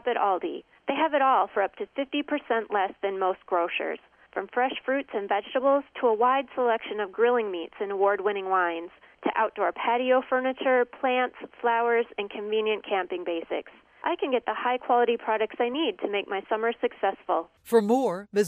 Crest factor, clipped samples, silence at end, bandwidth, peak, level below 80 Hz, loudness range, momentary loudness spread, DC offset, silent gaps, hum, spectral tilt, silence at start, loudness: 16 dB; under 0.1%; 0 s; 11 kHz; -10 dBFS; -72 dBFS; 3 LU; 9 LU; under 0.1%; none; none; -4.5 dB/octave; 0.05 s; -27 LUFS